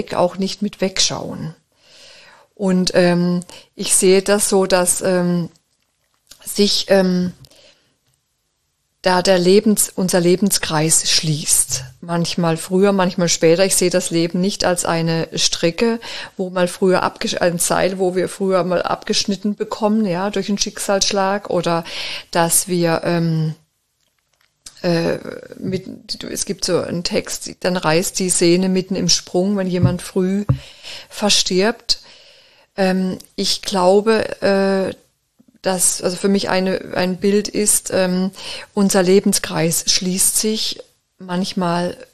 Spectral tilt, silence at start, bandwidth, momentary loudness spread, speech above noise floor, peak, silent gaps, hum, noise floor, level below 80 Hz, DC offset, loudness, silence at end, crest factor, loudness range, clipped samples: -4 dB/octave; 0 s; 14 kHz; 11 LU; 51 dB; 0 dBFS; none; none; -68 dBFS; -46 dBFS; 0.8%; -17 LUFS; 0 s; 18 dB; 4 LU; under 0.1%